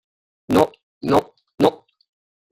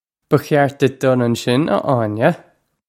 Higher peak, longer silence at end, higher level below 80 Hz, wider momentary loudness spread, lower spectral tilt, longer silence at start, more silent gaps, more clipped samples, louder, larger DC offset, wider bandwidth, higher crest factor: about the same, -2 dBFS vs 0 dBFS; first, 0.75 s vs 0.5 s; about the same, -54 dBFS vs -58 dBFS; about the same, 4 LU vs 4 LU; about the same, -6.5 dB/octave vs -6.5 dB/octave; first, 0.5 s vs 0.3 s; first, 0.83-1.01 s vs none; neither; second, -20 LUFS vs -17 LUFS; neither; about the same, 16 kHz vs 16.5 kHz; about the same, 20 dB vs 16 dB